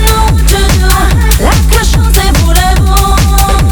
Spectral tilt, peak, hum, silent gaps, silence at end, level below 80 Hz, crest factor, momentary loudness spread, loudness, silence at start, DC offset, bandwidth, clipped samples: -4.5 dB/octave; 0 dBFS; none; none; 0 s; -8 dBFS; 6 dB; 1 LU; -8 LUFS; 0 s; under 0.1%; over 20 kHz; 0.3%